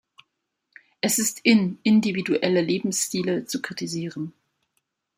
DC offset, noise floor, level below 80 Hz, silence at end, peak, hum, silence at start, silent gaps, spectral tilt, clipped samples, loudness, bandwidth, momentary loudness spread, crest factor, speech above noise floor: under 0.1%; -77 dBFS; -68 dBFS; 0.9 s; -6 dBFS; none; 1.05 s; none; -4 dB/octave; under 0.1%; -23 LUFS; 16 kHz; 11 LU; 20 dB; 54 dB